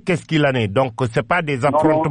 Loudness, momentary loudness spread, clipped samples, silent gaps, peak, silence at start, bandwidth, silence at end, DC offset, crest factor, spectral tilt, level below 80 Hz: -18 LUFS; 4 LU; under 0.1%; none; -6 dBFS; 0.05 s; 10.5 kHz; 0 s; under 0.1%; 12 dB; -6.5 dB/octave; -48 dBFS